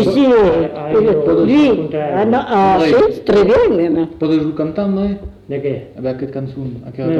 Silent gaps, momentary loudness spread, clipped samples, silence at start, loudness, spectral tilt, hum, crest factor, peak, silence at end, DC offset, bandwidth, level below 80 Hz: none; 13 LU; under 0.1%; 0 s; -14 LUFS; -8 dB/octave; none; 10 dB; -4 dBFS; 0 s; under 0.1%; 8.8 kHz; -40 dBFS